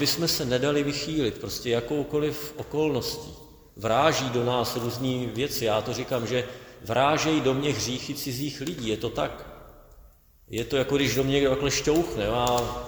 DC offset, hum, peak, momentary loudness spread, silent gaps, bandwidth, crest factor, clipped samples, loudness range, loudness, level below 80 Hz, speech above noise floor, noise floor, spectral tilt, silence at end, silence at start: under 0.1%; none; -6 dBFS; 9 LU; none; over 20 kHz; 20 dB; under 0.1%; 3 LU; -26 LUFS; -48 dBFS; 28 dB; -54 dBFS; -4.5 dB/octave; 0 s; 0 s